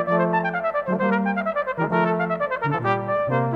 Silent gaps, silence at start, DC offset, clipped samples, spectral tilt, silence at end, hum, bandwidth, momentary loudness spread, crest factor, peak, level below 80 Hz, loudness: none; 0 s; under 0.1%; under 0.1%; -9 dB/octave; 0 s; none; 5.8 kHz; 3 LU; 16 dB; -8 dBFS; -58 dBFS; -23 LUFS